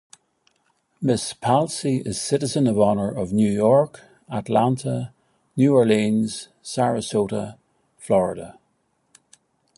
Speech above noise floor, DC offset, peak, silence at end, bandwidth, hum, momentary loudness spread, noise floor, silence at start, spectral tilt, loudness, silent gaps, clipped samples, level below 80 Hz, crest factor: 48 dB; under 0.1%; -4 dBFS; 1.25 s; 11.5 kHz; none; 14 LU; -69 dBFS; 1 s; -6 dB/octave; -21 LUFS; none; under 0.1%; -56 dBFS; 18 dB